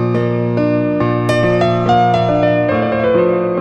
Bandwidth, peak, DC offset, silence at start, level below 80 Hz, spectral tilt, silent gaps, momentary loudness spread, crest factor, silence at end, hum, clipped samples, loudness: 10 kHz; 0 dBFS; under 0.1%; 0 s; -42 dBFS; -8 dB/octave; none; 3 LU; 12 dB; 0 s; none; under 0.1%; -14 LUFS